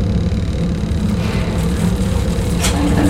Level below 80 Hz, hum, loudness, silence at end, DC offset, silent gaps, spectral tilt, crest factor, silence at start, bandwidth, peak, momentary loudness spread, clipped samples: -22 dBFS; none; -18 LUFS; 0 s; under 0.1%; none; -6 dB/octave; 12 dB; 0 s; 16 kHz; -4 dBFS; 3 LU; under 0.1%